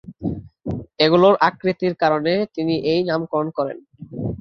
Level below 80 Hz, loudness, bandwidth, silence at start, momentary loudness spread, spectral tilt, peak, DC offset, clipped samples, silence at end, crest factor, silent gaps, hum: -48 dBFS; -20 LUFS; 6.4 kHz; 0.05 s; 16 LU; -7.5 dB/octave; -2 dBFS; under 0.1%; under 0.1%; 0.05 s; 18 dB; none; none